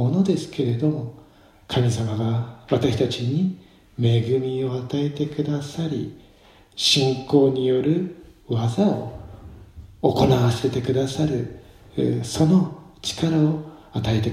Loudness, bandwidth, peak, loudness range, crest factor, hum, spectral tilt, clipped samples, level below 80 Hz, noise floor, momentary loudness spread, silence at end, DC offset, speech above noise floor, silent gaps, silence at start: -22 LUFS; 14.5 kHz; -2 dBFS; 3 LU; 20 dB; none; -6.5 dB/octave; under 0.1%; -48 dBFS; -52 dBFS; 12 LU; 0 s; under 0.1%; 31 dB; none; 0 s